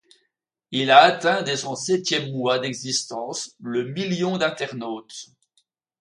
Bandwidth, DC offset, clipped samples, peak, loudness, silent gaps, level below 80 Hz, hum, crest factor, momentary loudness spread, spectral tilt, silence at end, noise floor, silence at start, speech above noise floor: 11.5 kHz; under 0.1%; under 0.1%; 0 dBFS; -22 LUFS; none; -70 dBFS; none; 22 dB; 17 LU; -3.5 dB/octave; 0.75 s; -76 dBFS; 0.7 s; 54 dB